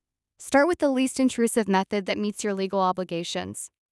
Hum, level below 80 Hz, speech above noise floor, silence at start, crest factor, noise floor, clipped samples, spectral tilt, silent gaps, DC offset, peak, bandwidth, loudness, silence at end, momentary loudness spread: none; -64 dBFS; 22 dB; 0.4 s; 16 dB; -47 dBFS; under 0.1%; -4.5 dB/octave; none; under 0.1%; -8 dBFS; 12 kHz; -25 LUFS; 0.25 s; 9 LU